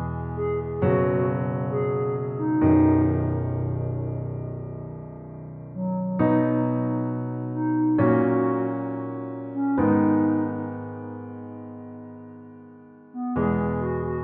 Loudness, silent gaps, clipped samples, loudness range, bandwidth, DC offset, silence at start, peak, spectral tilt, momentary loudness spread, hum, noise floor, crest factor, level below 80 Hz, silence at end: -24 LUFS; none; under 0.1%; 7 LU; 3.3 kHz; under 0.1%; 0 s; -8 dBFS; -10 dB/octave; 19 LU; none; -47 dBFS; 16 dB; -48 dBFS; 0 s